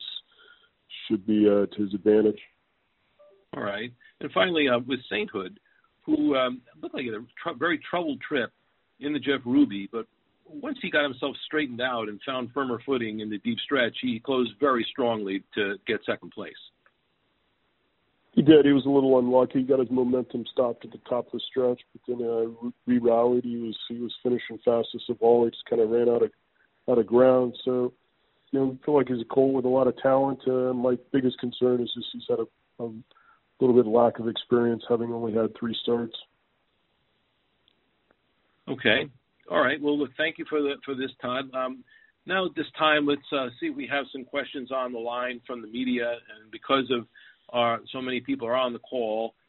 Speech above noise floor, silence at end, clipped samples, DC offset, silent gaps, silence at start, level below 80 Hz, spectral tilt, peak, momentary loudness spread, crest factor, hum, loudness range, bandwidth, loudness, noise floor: 46 dB; 0.2 s; under 0.1%; under 0.1%; none; 0 s; -68 dBFS; -3.5 dB/octave; -4 dBFS; 14 LU; 22 dB; none; 6 LU; 4.2 kHz; -26 LUFS; -72 dBFS